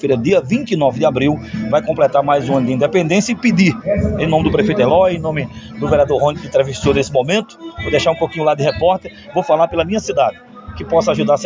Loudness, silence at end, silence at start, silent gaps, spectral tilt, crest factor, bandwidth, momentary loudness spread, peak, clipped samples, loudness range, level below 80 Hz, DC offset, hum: -15 LUFS; 0 s; 0.05 s; none; -6 dB/octave; 14 dB; 7.6 kHz; 8 LU; -2 dBFS; under 0.1%; 2 LU; -36 dBFS; under 0.1%; none